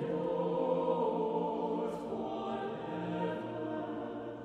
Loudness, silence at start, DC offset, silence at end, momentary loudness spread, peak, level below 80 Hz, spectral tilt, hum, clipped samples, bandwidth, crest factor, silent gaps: -36 LUFS; 0 s; under 0.1%; 0 s; 7 LU; -20 dBFS; -70 dBFS; -8 dB/octave; none; under 0.1%; 9.2 kHz; 14 dB; none